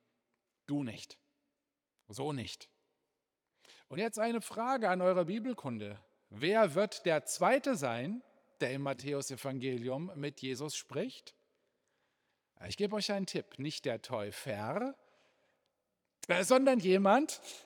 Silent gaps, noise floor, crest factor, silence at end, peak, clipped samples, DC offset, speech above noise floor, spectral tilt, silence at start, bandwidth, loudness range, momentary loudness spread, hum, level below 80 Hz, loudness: none; -88 dBFS; 22 dB; 0.05 s; -12 dBFS; under 0.1%; under 0.1%; 55 dB; -4.5 dB/octave; 0.7 s; 19.5 kHz; 10 LU; 16 LU; none; -82 dBFS; -34 LUFS